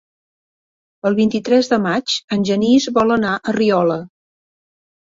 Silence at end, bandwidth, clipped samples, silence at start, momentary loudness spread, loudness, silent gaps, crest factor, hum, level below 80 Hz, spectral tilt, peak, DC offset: 0.95 s; 7.8 kHz; under 0.1%; 1.05 s; 6 LU; -17 LUFS; 2.24-2.28 s; 16 dB; none; -56 dBFS; -5 dB/octave; -2 dBFS; under 0.1%